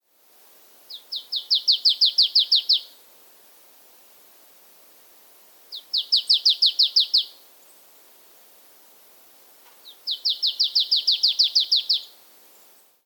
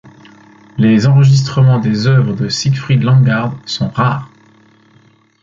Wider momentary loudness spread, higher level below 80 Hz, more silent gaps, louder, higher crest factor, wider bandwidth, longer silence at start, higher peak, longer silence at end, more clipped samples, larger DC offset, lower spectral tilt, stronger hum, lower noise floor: first, 17 LU vs 9 LU; second, under -90 dBFS vs -48 dBFS; neither; second, -18 LUFS vs -12 LUFS; first, 20 dB vs 12 dB; first, 19 kHz vs 7.6 kHz; first, 0.9 s vs 0.75 s; second, -6 dBFS vs -2 dBFS; second, 1 s vs 1.15 s; neither; neither; second, 4 dB/octave vs -6.5 dB/octave; neither; first, -56 dBFS vs -49 dBFS